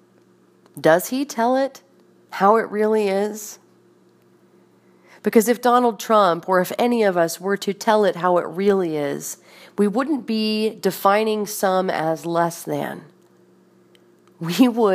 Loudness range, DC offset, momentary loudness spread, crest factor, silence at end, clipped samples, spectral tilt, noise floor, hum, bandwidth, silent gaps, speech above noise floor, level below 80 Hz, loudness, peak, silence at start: 4 LU; under 0.1%; 10 LU; 20 dB; 0 s; under 0.1%; -5 dB/octave; -55 dBFS; none; 15.5 kHz; none; 36 dB; -74 dBFS; -20 LUFS; -2 dBFS; 0.75 s